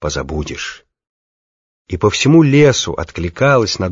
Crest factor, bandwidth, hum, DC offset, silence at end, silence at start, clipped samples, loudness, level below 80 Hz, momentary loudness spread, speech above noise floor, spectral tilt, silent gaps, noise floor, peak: 14 dB; 7.6 kHz; none; under 0.1%; 0 s; 0 s; under 0.1%; -14 LUFS; -36 dBFS; 15 LU; over 76 dB; -5.5 dB/octave; 1.09-1.85 s; under -90 dBFS; 0 dBFS